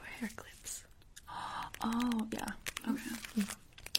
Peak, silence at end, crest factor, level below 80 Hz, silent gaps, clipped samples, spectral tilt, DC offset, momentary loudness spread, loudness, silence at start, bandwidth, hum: -8 dBFS; 0 s; 32 dB; -60 dBFS; none; under 0.1%; -3 dB/octave; under 0.1%; 12 LU; -40 LUFS; 0 s; 16.5 kHz; none